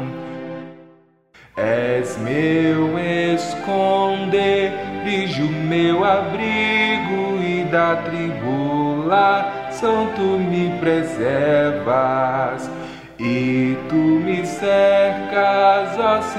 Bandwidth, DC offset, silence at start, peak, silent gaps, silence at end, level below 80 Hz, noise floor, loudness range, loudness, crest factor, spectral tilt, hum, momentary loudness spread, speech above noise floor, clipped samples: 11.5 kHz; 0.2%; 0 s; -4 dBFS; none; 0 s; -56 dBFS; -51 dBFS; 2 LU; -18 LUFS; 16 dB; -6.5 dB/octave; none; 8 LU; 34 dB; under 0.1%